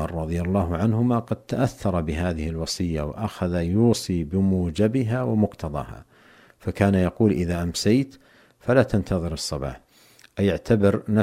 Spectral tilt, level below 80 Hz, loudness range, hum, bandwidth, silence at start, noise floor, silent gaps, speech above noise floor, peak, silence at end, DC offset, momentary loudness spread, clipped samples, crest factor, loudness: -6.5 dB/octave; -42 dBFS; 2 LU; none; 15.5 kHz; 0 s; -54 dBFS; none; 32 dB; -4 dBFS; 0 s; under 0.1%; 11 LU; under 0.1%; 18 dB; -24 LUFS